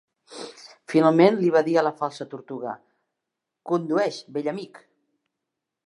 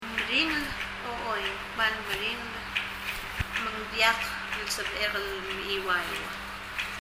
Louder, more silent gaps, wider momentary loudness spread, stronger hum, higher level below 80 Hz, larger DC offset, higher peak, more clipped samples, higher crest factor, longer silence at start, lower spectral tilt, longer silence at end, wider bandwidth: first, -22 LUFS vs -29 LUFS; neither; first, 23 LU vs 9 LU; neither; second, -80 dBFS vs -50 dBFS; neither; first, -2 dBFS vs -8 dBFS; neither; about the same, 22 dB vs 22 dB; first, 0.3 s vs 0 s; first, -6.5 dB/octave vs -2.5 dB/octave; first, 1.1 s vs 0 s; second, 11 kHz vs 16 kHz